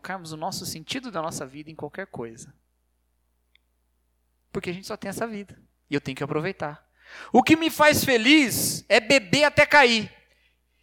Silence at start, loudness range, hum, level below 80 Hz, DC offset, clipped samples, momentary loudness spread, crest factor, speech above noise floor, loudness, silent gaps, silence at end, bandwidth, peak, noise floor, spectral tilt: 0.05 s; 20 LU; 60 Hz at -60 dBFS; -58 dBFS; under 0.1%; under 0.1%; 20 LU; 22 dB; 48 dB; -21 LUFS; none; 0.75 s; 18.5 kHz; -4 dBFS; -71 dBFS; -3.5 dB/octave